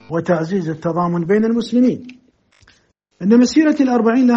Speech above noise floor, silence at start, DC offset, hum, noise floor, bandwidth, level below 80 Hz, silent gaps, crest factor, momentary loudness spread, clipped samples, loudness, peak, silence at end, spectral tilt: 43 dB; 0.1 s; under 0.1%; none; -58 dBFS; 7.8 kHz; -58 dBFS; none; 14 dB; 8 LU; under 0.1%; -16 LUFS; -2 dBFS; 0 s; -6.5 dB/octave